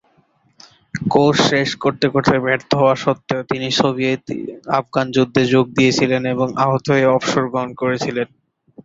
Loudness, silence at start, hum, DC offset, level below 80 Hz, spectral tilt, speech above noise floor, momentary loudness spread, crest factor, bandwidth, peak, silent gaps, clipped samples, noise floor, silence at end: -17 LUFS; 0.95 s; none; under 0.1%; -54 dBFS; -5.5 dB/octave; 42 dB; 8 LU; 18 dB; 7.8 kHz; 0 dBFS; none; under 0.1%; -59 dBFS; 0.05 s